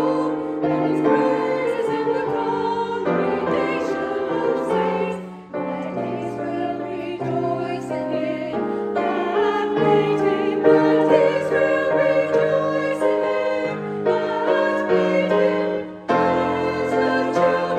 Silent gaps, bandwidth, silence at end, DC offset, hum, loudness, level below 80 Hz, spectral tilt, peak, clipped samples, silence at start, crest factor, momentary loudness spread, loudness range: none; 9.8 kHz; 0 s; under 0.1%; none; -21 LUFS; -60 dBFS; -7 dB/octave; -2 dBFS; under 0.1%; 0 s; 18 dB; 8 LU; 7 LU